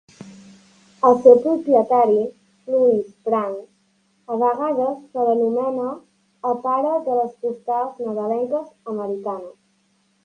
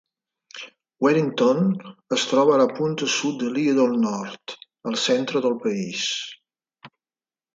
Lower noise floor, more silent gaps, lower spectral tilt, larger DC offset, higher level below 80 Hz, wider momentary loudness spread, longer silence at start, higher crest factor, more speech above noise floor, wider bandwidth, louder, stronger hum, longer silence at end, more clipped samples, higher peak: second, -64 dBFS vs under -90 dBFS; neither; first, -8 dB/octave vs -4.5 dB/octave; neither; about the same, -72 dBFS vs -72 dBFS; second, 13 LU vs 18 LU; second, 0.2 s vs 0.55 s; about the same, 20 dB vs 18 dB; second, 45 dB vs over 68 dB; second, 7 kHz vs 9.2 kHz; about the same, -20 LUFS vs -22 LUFS; neither; about the same, 0.75 s vs 0.7 s; neither; first, 0 dBFS vs -6 dBFS